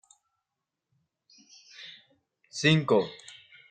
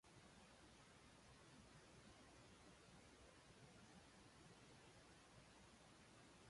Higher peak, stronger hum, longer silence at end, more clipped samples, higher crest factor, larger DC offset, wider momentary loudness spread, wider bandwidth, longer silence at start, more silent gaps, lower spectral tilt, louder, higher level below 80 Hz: first, -8 dBFS vs -54 dBFS; neither; first, 0.4 s vs 0 s; neither; first, 24 dB vs 14 dB; neither; first, 24 LU vs 1 LU; second, 9.2 kHz vs 11.5 kHz; first, 1.8 s vs 0.05 s; neither; about the same, -5 dB/octave vs -4 dB/octave; first, -25 LUFS vs -67 LUFS; first, -68 dBFS vs -78 dBFS